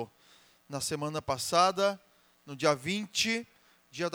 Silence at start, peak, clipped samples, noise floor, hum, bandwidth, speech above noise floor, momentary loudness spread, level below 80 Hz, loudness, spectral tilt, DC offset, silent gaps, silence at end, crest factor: 0 s; -10 dBFS; under 0.1%; -62 dBFS; none; over 20 kHz; 32 dB; 19 LU; -68 dBFS; -30 LUFS; -3 dB/octave; under 0.1%; none; 0.05 s; 22 dB